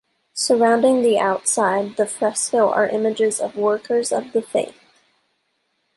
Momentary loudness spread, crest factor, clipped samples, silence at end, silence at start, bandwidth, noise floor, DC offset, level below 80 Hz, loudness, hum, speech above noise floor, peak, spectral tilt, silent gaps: 8 LU; 16 dB; under 0.1%; 1.25 s; 0.35 s; 11.5 kHz; -70 dBFS; under 0.1%; -70 dBFS; -19 LUFS; none; 51 dB; -4 dBFS; -3 dB/octave; none